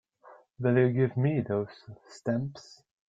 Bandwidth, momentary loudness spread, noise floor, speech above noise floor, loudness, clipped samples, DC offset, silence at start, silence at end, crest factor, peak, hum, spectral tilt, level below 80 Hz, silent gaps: 7.8 kHz; 22 LU; -56 dBFS; 28 dB; -29 LUFS; under 0.1%; under 0.1%; 0.25 s; 0.5 s; 18 dB; -10 dBFS; none; -8.5 dB/octave; -66 dBFS; none